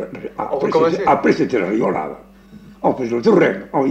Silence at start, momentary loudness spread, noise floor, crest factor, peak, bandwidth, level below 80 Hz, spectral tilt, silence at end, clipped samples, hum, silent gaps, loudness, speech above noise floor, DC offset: 0 s; 12 LU; -42 dBFS; 16 dB; -2 dBFS; 8.4 kHz; -52 dBFS; -7 dB/octave; 0 s; under 0.1%; none; none; -17 LUFS; 25 dB; under 0.1%